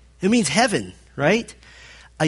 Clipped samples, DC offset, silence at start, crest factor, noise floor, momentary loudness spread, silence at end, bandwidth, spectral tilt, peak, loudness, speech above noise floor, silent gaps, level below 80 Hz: under 0.1%; under 0.1%; 0.2 s; 18 dB; -46 dBFS; 15 LU; 0 s; 11.5 kHz; -4 dB/octave; -4 dBFS; -20 LUFS; 26 dB; none; -52 dBFS